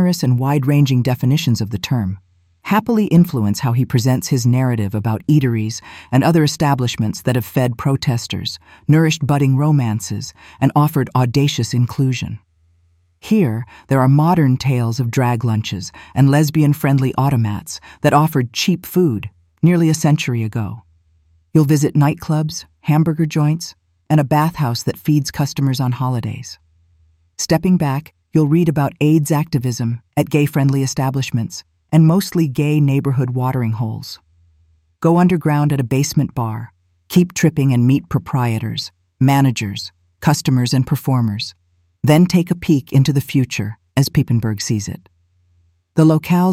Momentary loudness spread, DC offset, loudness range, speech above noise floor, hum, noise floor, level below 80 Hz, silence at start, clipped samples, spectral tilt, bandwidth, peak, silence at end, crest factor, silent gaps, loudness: 11 LU; under 0.1%; 2 LU; 42 dB; none; -58 dBFS; -48 dBFS; 0 s; under 0.1%; -6.5 dB/octave; 16 kHz; -2 dBFS; 0 s; 14 dB; none; -17 LUFS